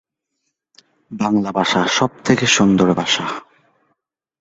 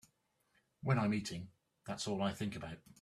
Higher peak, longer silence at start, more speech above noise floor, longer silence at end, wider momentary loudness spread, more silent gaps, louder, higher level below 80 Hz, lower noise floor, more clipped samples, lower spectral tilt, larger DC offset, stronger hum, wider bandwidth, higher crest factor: first, -2 dBFS vs -18 dBFS; first, 1.1 s vs 0.85 s; first, 58 dB vs 40 dB; first, 1 s vs 0.1 s; second, 12 LU vs 16 LU; neither; first, -16 LUFS vs -39 LUFS; first, -52 dBFS vs -68 dBFS; second, -74 dBFS vs -78 dBFS; neither; second, -4 dB/octave vs -5.5 dB/octave; neither; neither; second, 8 kHz vs 13.5 kHz; about the same, 18 dB vs 22 dB